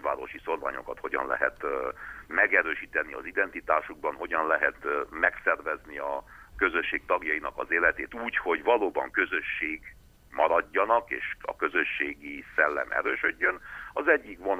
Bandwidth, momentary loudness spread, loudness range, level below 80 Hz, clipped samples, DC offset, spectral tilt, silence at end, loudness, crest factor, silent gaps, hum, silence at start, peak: 15 kHz; 10 LU; 1 LU; -56 dBFS; under 0.1%; under 0.1%; -5 dB/octave; 0 s; -28 LUFS; 20 dB; none; none; 0 s; -8 dBFS